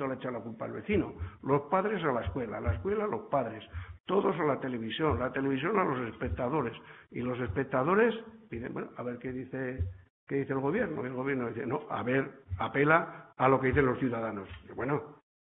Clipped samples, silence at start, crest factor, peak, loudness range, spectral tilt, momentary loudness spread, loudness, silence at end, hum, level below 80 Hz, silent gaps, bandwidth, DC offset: under 0.1%; 0 s; 22 dB; -10 dBFS; 4 LU; -10.5 dB/octave; 13 LU; -32 LUFS; 0.4 s; none; -52 dBFS; 4.00-4.04 s, 10.10-10.27 s; 4 kHz; under 0.1%